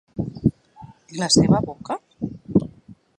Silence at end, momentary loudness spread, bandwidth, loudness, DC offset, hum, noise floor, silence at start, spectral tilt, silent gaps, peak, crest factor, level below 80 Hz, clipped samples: 0.25 s; 17 LU; 11 kHz; -22 LUFS; under 0.1%; none; -47 dBFS; 0.15 s; -5 dB/octave; none; -4 dBFS; 20 dB; -46 dBFS; under 0.1%